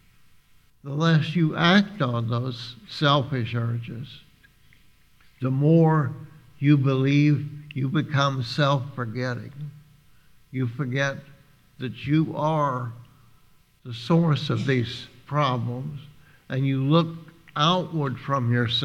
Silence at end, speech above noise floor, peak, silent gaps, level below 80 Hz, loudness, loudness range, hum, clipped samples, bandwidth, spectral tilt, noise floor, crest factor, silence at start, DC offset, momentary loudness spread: 0 s; 34 dB; -4 dBFS; none; -62 dBFS; -24 LUFS; 6 LU; none; under 0.1%; 7.8 kHz; -7 dB/octave; -57 dBFS; 22 dB; 0.85 s; under 0.1%; 16 LU